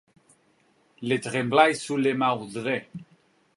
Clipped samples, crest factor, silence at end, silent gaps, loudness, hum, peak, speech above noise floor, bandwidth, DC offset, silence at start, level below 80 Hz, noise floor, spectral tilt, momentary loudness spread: under 0.1%; 22 dB; 0.55 s; none; -24 LUFS; none; -4 dBFS; 40 dB; 11.5 kHz; under 0.1%; 1 s; -72 dBFS; -64 dBFS; -5 dB/octave; 15 LU